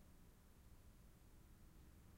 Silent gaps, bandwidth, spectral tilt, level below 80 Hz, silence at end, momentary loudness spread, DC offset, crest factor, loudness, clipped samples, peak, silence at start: none; 16 kHz; -5.5 dB/octave; -68 dBFS; 0 s; 2 LU; under 0.1%; 12 dB; -68 LUFS; under 0.1%; -54 dBFS; 0 s